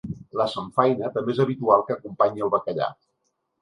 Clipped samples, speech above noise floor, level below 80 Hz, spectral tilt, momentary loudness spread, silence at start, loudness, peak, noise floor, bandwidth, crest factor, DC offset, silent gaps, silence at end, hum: under 0.1%; 52 dB; -60 dBFS; -7.5 dB/octave; 9 LU; 0.05 s; -24 LUFS; -2 dBFS; -75 dBFS; 11 kHz; 22 dB; under 0.1%; none; 0.7 s; none